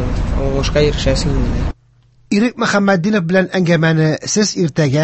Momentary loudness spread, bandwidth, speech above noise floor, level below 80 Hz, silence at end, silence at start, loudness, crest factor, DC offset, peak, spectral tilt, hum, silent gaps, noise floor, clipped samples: 6 LU; 8.6 kHz; 37 dB; -24 dBFS; 0 s; 0 s; -15 LUFS; 14 dB; under 0.1%; 0 dBFS; -5.5 dB/octave; none; none; -51 dBFS; under 0.1%